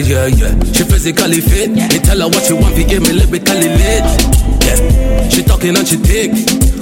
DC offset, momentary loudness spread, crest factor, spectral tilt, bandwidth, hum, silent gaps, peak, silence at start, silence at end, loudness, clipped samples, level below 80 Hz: under 0.1%; 2 LU; 10 dB; -4.5 dB/octave; 17.5 kHz; none; none; 0 dBFS; 0 s; 0 s; -11 LUFS; under 0.1%; -12 dBFS